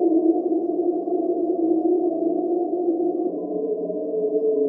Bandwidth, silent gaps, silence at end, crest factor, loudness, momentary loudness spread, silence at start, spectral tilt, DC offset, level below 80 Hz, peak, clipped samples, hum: 1.2 kHz; none; 0 s; 14 dB; -23 LUFS; 6 LU; 0 s; -13.5 dB/octave; under 0.1%; -78 dBFS; -8 dBFS; under 0.1%; none